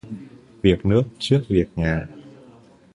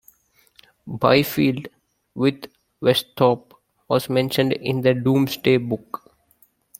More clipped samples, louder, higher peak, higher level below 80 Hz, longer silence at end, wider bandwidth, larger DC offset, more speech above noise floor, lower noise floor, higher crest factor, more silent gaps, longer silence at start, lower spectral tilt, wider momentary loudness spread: neither; about the same, -21 LUFS vs -21 LUFS; about the same, -2 dBFS vs -2 dBFS; first, -38 dBFS vs -60 dBFS; second, 0.65 s vs 1 s; second, 11 kHz vs 16.5 kHz; neither; second, 30 dB vs 40 dB; second, -49 dBFS vs -60 dBFS; about the same, 20 dB vs 20 dB; neither; second, 0.05 s vs 0.85 s; first, -7.5 dB/octave vs -6 dB/octave; about the same, 18 LU vs 19 LU